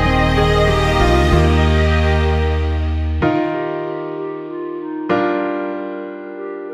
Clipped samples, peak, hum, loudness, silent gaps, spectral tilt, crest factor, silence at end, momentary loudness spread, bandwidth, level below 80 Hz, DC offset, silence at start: under 0.1%; -2 dBFS; none; -17 LUFS; none; -7 dB/octave; 14 dB; 0 s; 13 LU; 10.5 kHz; -22 dBFS; under 0.1%; 0 s